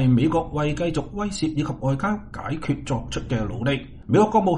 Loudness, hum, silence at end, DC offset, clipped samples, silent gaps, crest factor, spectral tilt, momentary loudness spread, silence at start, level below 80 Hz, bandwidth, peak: -24 LUFS; none; 0 s; under 0.1%; under 0.1%; none; 18 dB; -7 dB/octave; 10 LU; 0 s; -40 dBFS; 10.5 kHz; -4 dBFS